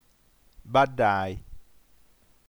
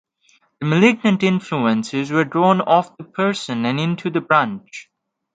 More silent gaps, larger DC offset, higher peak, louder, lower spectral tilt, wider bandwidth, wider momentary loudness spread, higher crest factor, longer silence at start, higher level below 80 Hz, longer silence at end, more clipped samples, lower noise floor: neither; neither; second, -10 dBFS vs 0 dBFS; second, -25 LUFS vs -18 LUFS; about the same, -6.5 dB/octave vs -6.5 dB/octave; first, over 20 kHz vs 9.2 kHz; about the same, 13 LU vs 12 LU; about the same, 20 dB vs 18 dB; about the same, 0.65 s vs 0.6 s; first, -52 dBFS vs -64 dBFS; first, 0.9 s vs 0.55 s; neither; about the same, -61 dBFS vs -59 dBFS